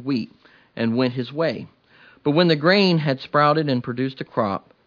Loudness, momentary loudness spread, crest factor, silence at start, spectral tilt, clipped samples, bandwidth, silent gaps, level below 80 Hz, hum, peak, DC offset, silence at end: -21 LUFS; 11 LU; 18 dB; 0 s; -7.5 dB/octave; under 0.1%; 5.4 kHz; none; -66 dBFS; none; -4 dBFS; under 0.1%; 0.3 s